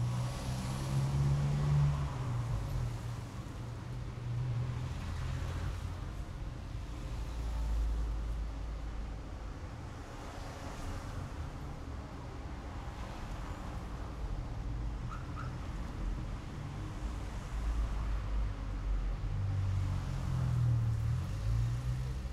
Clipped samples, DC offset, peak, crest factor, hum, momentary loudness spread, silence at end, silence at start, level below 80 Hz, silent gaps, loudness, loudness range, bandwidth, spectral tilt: under 0.1%; under 0.1%; -20 dBFS; 16 dB; none; 12 LU; 0 s; 0 s; -40 dBFS; none; -38 LUFS; 9 LU; 12.5 kHz; -7 dB/octave